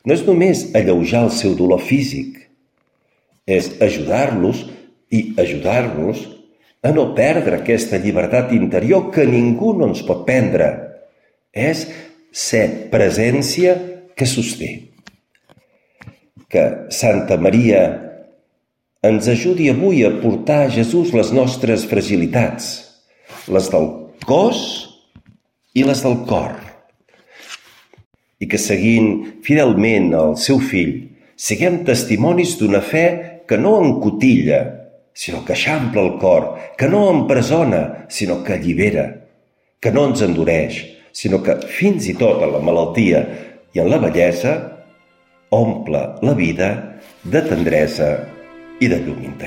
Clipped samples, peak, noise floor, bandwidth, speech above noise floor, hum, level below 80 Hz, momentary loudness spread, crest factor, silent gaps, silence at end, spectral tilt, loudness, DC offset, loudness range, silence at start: under 0.1%; 0 dBFS; -70 dBFS; 16.5 kHz; 55 dB; none; -46 dBFS; 13 LU; 16 dB; 28.06-28.11 s; 0 s; -6 dB/octave; -16 LUFS; under 0.1%; 4 LU; 0.05 s